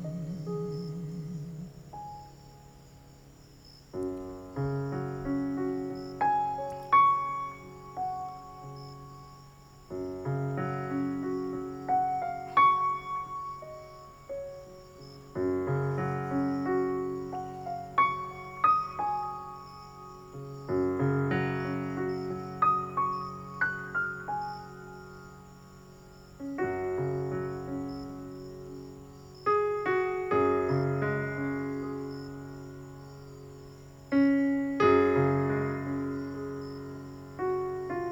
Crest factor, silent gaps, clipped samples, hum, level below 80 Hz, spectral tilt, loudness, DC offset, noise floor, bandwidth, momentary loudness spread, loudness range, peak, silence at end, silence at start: 20 dB; none; under 0.1%; none; -58 dBFS; -8 dB/octave; -31 LUFS; under 0.1%; -53 dBFS; over 20 kHz; 21 LU; 9 LU; -12 dBFS; 0 s; 0 s